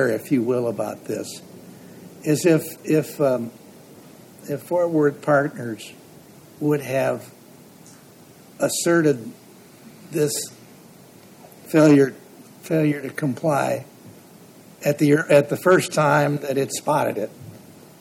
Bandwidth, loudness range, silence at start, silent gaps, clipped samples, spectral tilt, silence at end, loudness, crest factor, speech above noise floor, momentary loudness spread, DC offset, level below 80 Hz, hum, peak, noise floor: 17.5 kHz; 5 LU; 0 s; none; under 0.1%; -5.5 dB/octave; 0.4 s; -21 LUFS; 20 dB; 27 dB; 17 LU; under 0.1%; -70 dBFS; none; -4 dBFS; -47 dBFS